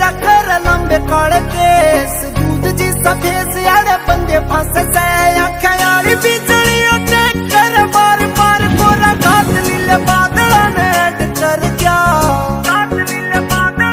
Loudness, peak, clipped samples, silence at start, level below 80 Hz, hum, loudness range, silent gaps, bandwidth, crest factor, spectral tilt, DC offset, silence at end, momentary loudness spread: -11 LUFS; 0 dBFS; under 0.1%; 0 s; -26 dBFS; none; 2 LU; none; 16.5 kHz; 12 dB; -4 dB/octave; under 0.1%; 0 s; 5 LU